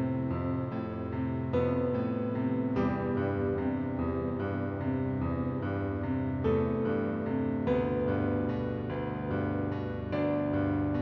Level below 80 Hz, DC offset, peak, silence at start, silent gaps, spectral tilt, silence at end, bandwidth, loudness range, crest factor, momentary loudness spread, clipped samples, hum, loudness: -48 dBFS; under 0.1%; -16 dBFS; 0 s; none; -8 dB/octave; 0 s; 5.6 kHz; 1 LU; 14 dB; 5 LU; under 0.1%; none; -32 LUFS